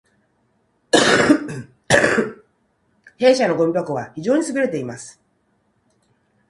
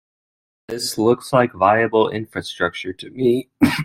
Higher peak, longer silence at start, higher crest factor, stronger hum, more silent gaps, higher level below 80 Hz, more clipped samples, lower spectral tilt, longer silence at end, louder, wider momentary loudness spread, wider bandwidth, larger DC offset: about the same, 0 dBFS vs -2 dBFS; first, 0.95 s vs 0.7 s; about the same, 20 dB vs 18 dB; neither; neither; about the same, -54 dBFS vs -54 dBFS; neither; about the same, -4 dB/octave vs -5 dB/octave; first, 1.4 s vs 0 s; about the same, -18 LUFS vs -19 LUFS; first, 17 LU vs 13 LU; second, 11.5 kHz vs 16 kHz; neither